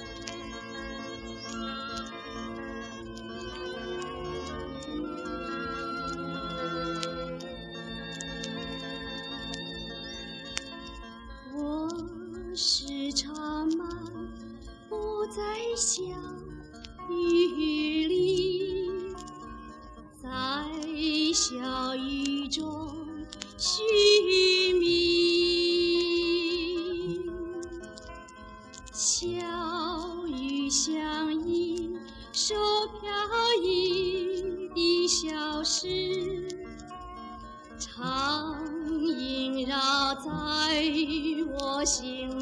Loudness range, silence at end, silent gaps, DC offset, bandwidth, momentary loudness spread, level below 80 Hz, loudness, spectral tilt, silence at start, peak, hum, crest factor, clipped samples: 12 LU; 0 s; none; under 0.1%; 11 kHz; 17 LU; -52 dBFS; -29 LUFS; -2.5 dB/octave; 0 s; -8 dBFS; none; 22 dB; under 0.1%